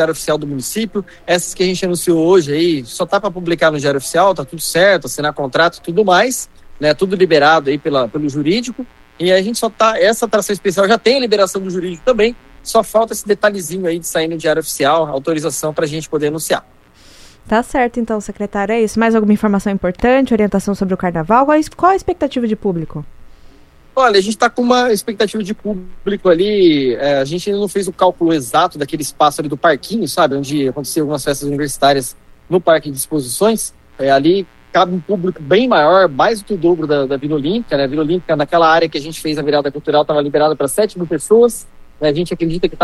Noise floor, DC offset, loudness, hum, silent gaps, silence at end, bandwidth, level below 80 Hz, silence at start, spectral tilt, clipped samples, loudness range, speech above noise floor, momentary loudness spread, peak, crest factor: -43 dBFS; under 0.1%; -15 LUFS; none; none; 0 s; 13.5 kHz; -42 dBFS; 0 s; -4.5 dB/octave; under 0.1%; 3 LU; 28 dB; 8 LU; 0 dBFS; 14 dB